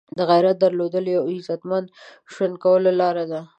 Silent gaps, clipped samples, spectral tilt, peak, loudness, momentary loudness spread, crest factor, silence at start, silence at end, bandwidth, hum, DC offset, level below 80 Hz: none; under 0.1%; -7.5 dB/octave; -4 dBFS; -20 LUFS; 9 LU; 16 dB; 0.15 s; 0.15 s; 8.2 kHz; none; under 0.1%; -74 dBFS